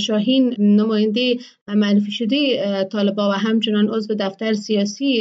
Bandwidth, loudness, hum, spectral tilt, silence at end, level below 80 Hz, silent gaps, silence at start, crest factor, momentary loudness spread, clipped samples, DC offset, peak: 7.8 kHz; -19 LUFS; none; -6 dB/octave; 0 s; -74 dBFS; 1.61-1.66 s; 0 s; 12 dB; 6 LU; under 0.1%; under 0.1%; -6 dBFS